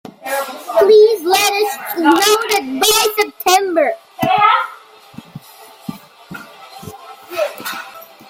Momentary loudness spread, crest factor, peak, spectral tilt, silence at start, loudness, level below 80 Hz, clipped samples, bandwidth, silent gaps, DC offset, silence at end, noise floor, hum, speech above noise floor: 23 LU; 16 dB; 0 dBFS; -2 dB/octave; 0.25 s; -14 LUFS; -60 dBFS; under 0.1%; 17 kHz; none; under 0.1%; 0.25 s; -41 dBFS; none; 27 dB